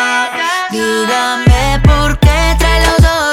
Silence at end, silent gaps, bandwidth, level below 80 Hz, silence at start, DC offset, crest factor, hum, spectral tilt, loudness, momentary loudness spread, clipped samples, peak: 0 s; none; 16.5 kHz; -14 dBFS; 0 s; under 0.1%; 10 dB; none; -4.5 dB/octave; -11 LUFS; 5 LU; under 0.1%; 0 dBFS